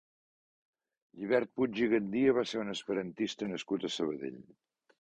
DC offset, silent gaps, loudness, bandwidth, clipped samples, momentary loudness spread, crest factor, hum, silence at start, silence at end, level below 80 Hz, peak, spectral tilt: under 0.1%; none; -33 LUFS; 9.2 kHz; under 0.1%; 11 LU; 20 dB; none; 1.15 s; 0.6 s; -72 dBFS; -14 dBFS; -5 dB/octave